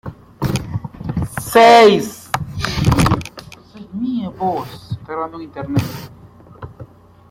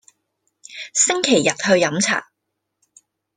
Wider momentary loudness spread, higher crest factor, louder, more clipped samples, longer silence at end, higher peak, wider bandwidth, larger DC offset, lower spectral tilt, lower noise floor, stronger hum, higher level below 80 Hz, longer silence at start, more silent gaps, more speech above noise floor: first, 24 LU vs 11 LU; about the same, 18 dB vs 20 dB; about the same, -16 LUFS vs -17 LUFS; neither; second, 0.45 s vs 1.15 s; about the same, 0 dBFS vs -2 dBFS; first, 16.5 kHz vs 10.5 kHz; neither; first, -5.5 dB/octave vs -2.5 dB/octave; second, -40 dBFS vs -77 dBFS; neither; first, -36 dBFS vs -62 dBFS; second, 0.05 s vs 0.7 s; neither; second, 26 dB vs 60 dB